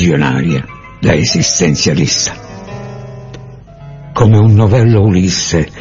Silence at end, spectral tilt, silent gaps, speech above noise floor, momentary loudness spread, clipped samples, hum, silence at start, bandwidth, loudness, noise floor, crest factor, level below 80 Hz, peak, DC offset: 0 s; -5 dB/octave; none; 22 dB; 21 LU; under 0.1%; none; 0 s; 7.6 kHz; -11 LUFS; -32 dBFS; 12 dB; -36 dBFS; 0 dBFS; under 0.1%